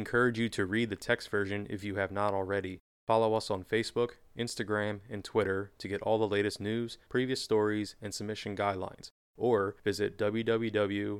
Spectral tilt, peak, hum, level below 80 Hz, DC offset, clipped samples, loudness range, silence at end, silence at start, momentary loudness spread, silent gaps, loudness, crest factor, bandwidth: -5.5 dB/octave; -12 dBFS; none; -64 dBFS; under 0.1%; under 0.1%; 1 LU; 0 s; 0 s; 9 LU; 2.80-3.07 s, 9.11-9.34 s; -32 LUFS; 20 dB; 15.5 kHz